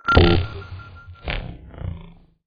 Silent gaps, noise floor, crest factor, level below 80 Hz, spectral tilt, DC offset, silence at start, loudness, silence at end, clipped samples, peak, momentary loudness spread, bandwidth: none; -44 dBFS; 20 dB; -30 dBFS; -8 dB/octave; under 0.1%; 0.05 s; -21 LUFS; 0.4 s; under 0.1%; -2 dBFS; 24 LU; 6.6 kHz